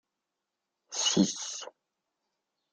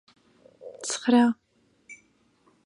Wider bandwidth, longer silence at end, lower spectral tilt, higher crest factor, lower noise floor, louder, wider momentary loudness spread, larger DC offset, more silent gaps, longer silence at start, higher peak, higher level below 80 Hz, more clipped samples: about the same, 10 kHz vs 11 kHz; first, 1.05 s vs 0.7 s; about the same, -3 dB/octave vs -3.5 dB/octave; about the same, 22 dB vs 20 dB; first, -86 dBFS vs -64 dBFS; second, -29 LUFS vs -24 LUFS; second, 15 LU vs 27 LU; neither; neither; first, 0.9 s vs 0.65 s; second, -12 dBFS vs -8 dBFS; about the same, -72 dBFS vs -76 dBFS; neither